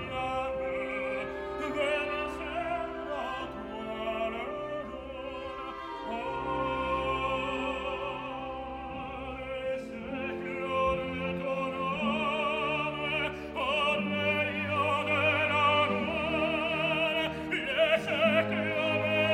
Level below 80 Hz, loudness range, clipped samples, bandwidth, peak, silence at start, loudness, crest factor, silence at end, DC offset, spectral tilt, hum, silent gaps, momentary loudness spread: -52 dBFS; 8 LU; under 0.1%; 15.5 kHz; -12 dBFS; 0 s; -31 LUFS; 20 dB; 0 s; under 0.1%; -5.5 dB/octave; none; none; 12 LU